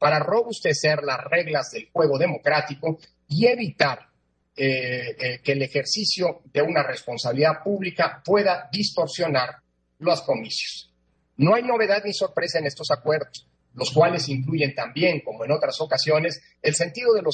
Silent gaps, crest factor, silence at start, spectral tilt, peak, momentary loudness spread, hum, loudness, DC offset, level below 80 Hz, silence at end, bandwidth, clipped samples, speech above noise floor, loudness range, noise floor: none; 20 dB; 0 s; -4.5 dB/octave; -4 dBFS; 8 LU; none; -23 LUFS; under 0.1%; -68 dBFS; 0 s; 9.6 kHz; under 0.1%; 43 dB; 2 LU; -66 dBFS